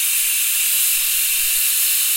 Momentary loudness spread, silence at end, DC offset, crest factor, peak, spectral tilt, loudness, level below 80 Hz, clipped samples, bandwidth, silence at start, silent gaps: 1 LU; 0 s; under 0.1%; 14 dB; -4 dBFS; 6 dB/octave; -15 LUFS; -52 dBFS; under 0.1%; 16.5 kHz; 0 s; none